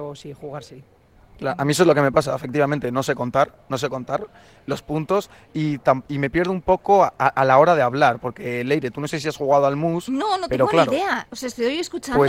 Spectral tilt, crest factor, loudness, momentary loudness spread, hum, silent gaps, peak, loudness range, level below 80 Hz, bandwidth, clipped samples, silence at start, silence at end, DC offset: -5.5 dB/octave; 20 dB; -20 LUFS; 14 LU; none; none; -2 dBFS; 5 LU; -50 dBFS; 16.5 kHz; under 0.1%; 0 s; 0 s; under 0.1%